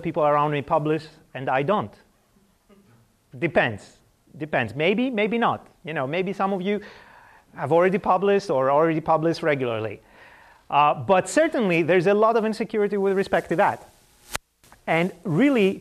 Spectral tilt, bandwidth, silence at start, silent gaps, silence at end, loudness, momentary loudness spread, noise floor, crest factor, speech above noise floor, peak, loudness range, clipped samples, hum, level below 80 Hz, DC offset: -6 dB/octave; 14.5 kHz; 0 s; none; 0 s; -22 LUFS; 14 LU; -62 dBFS; 16 dB; 40 dB; -6 dBFS; 6 LU; under 0.1%; none; -60 dBFS; under 0.1%